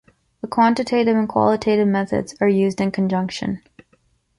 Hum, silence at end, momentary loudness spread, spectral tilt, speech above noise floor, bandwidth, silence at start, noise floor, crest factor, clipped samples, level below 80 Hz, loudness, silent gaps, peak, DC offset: none; 0.8 s; 9 LU; -6.5 dB/octave; 43 dB; 11.5 kHz; 0.45 s; -62 dBFS; 16 dB; under 0.1%; -54 dBFS; -19 LUFS; none; -4 dBFS; under 0.1%